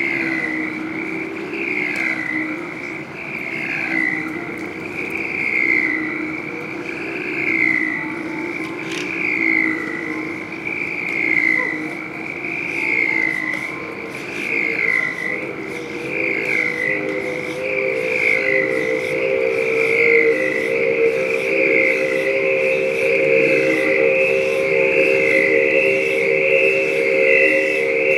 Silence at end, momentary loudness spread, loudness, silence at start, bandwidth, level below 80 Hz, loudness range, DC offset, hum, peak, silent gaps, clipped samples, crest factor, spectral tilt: 0 s; 11 LU; -18 LUFS; 0 s; 14.5 kHz; -60 dBFS; 6 LU; under 0.1%; none; -2 dBFS; none; under 0.1%; 18 dB; -5 dB/octave